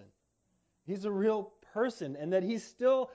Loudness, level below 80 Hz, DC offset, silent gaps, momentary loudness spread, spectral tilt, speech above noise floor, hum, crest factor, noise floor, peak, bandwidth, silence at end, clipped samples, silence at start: -33 LUFS; -78 dBFS; under 0.1%; none; 11 LU; -6.5 dB/octave; 46 dB; none; 16 dB; -77 dBFS; -18 dBFS; 8 kHz; 0 s; under 0.1%; 0 s